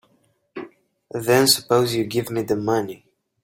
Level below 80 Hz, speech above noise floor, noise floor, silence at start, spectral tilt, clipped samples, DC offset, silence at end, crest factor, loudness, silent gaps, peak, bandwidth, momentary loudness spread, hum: -60 dBFS; 44 dB; -64 dBFS; 0.55 s; -4 dB/octave; under 0.1%; under 0.1%; 0.5 s; 20 dB; -20 LUFS; none; -2 dBFS; 16.5 kHz; 22 LU; none